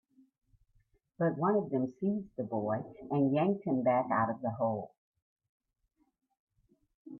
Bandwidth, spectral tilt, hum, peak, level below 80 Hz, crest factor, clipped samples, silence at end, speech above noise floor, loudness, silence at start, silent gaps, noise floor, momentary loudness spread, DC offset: 4.2 kHz; -11 dB/octave; none; -16 dBFS; -74 dBFS; 18 dB; under 0.1%; 0 s; 40 dB; -32 LUFS; 1.2 s; 4.98-5.12 s, 5.22-5.36 s, 5.49-5.60 s, 6.39-6.47 s, 6.95-7.05 s; -72 dBFS; 8 LU; under 0.1%